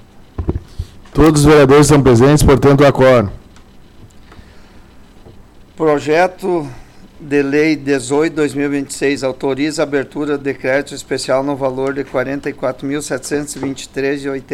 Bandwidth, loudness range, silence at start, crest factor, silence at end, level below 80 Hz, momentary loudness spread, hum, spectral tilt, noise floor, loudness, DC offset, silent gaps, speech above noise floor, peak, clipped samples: 16.5 kHz; 10 LU; 0.15 s; 12 dB; 0 s; -32 dBFS; 14 LU; none; -6 dB/octave; -40 dBFS; -14 LUFS; under 0.1%; none; 27 dB; -2 dBFS; under 0.1%